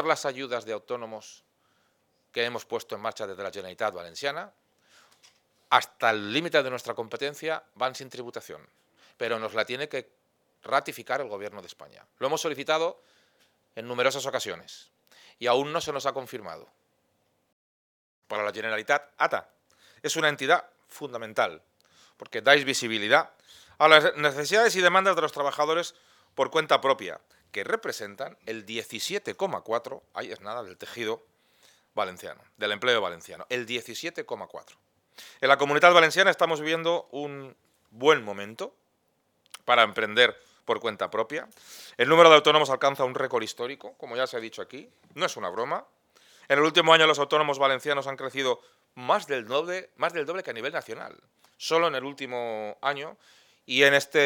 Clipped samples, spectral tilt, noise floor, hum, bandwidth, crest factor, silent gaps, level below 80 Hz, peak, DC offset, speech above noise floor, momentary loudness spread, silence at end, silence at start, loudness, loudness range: under 0.1%; -3 dB/octave; -72 dBFS; none; 19 kHz; 28 dB; 17.52-18.22 s; -82 dBFS; 0 dBFS; under 0.1%; 46 dB; 19 LU; 0 s; 0 s; -25 LUFS; 11 LU